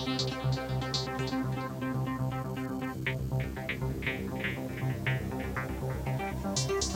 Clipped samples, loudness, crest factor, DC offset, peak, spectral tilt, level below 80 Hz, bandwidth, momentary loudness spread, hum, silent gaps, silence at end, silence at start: under 0.1%; -33 LUFS; 14 dB; under 0.1%; -18 dBFS; -5 dB/octave; -46 dBFS; 16.5 kHz; 4 LU; none; none; 0 s; 0 s